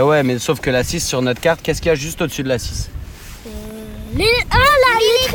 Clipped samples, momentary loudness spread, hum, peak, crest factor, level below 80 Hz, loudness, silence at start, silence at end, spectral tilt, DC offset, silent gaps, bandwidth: under 0.1%; 20 LU; none; -2 dBFS; 16 dB; -30 dBFS; -16 LUFS; 0 s; 0 s; -4 dB/octave; under 0.1%; none; 19 kHz